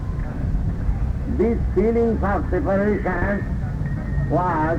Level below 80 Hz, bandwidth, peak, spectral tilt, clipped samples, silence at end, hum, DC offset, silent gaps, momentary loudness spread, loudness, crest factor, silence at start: -26 dBFS; 7.6 kHz; -8 dBFS; -10 dB/octave; under 0.1%; 0 s; none; under 0.1%; none; 6 LU; -22 LUFS; 12 dB; 0 s